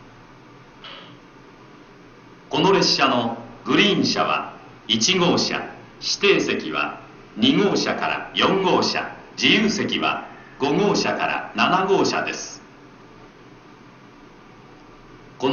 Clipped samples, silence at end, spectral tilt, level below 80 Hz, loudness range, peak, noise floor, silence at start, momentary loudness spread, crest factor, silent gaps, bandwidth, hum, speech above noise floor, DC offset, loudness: under 0.1%; 0 s; -3.5 dB/octave; -56 dBFS; 5 LU; -2 dBFS; -46 dBFS; 0.8 s; 19 LU; 20 dB; none; 7.2 kHz; none; 26 dB; under 0.1%; -20 LUFS